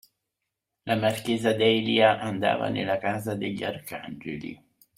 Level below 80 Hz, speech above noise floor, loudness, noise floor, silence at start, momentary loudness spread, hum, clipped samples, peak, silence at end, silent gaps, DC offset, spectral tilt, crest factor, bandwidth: -64 dBFS; 58 dB; -25 LUFS; -84 dBFS; 0.85 s; 16 LU; none; under 0.1%; -6 dBFS; 0.45 s; none; under 0.1%; -5.5 dB/octave; 22 dB; 16 kHz